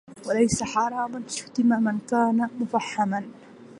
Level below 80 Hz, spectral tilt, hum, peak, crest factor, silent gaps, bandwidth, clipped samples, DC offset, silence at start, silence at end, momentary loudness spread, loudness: -58 dBFS; -5 dB/octave; none; -8 dBFS; 16 dB; none; 11.5 kHz; under 0.1%; under 0.1%; 0.1 s; 0 s; 8 LU; -25 LUFS